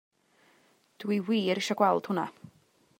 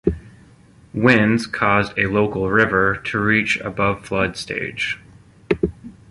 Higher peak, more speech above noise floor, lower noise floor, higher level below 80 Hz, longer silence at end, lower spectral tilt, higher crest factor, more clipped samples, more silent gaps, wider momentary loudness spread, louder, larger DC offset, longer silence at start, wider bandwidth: second, -12 dBFS vs -2 dBFS; first, 38 dB vs 30 dB; first, -66 dBFS vs -49 dBFS; second, -84 dBFS vs -42 dBFS; first, 0.5 s vs 0.2 s; about the same, -5.5 dB/octave vs -6 dB/octave; about the same, 20 dB vs 18 dB; neither; neither; about the same, 10 LU vs 10 LU; second, -29 LUFS vs -19 LUFS; neither; first, 1 s vs 0.05 s; first, 16 kHz vs 11.5 kHz